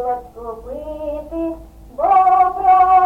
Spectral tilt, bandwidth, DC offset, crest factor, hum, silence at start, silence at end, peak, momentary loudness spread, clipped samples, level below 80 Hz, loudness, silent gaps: -7 dB/octave; 4 kHz; under 0.1%; 12 dB; none; 0 s; 0 s; -4 dBFS; 20 LU; under 0.1%; -42 dBFS; -16 LUFS; none